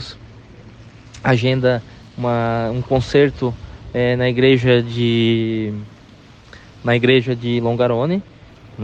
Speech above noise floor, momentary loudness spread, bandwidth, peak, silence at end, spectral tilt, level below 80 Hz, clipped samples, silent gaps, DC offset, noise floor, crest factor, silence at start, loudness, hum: 27 dB; 12 LU; 8 kHz; -2 dBFS; 0 s; -7.5 dB/octave; -44 dBFS; under 0.1%; none; under 0.1%; -44 dBFS; 18 dB; 0 s; -18 LUFS; none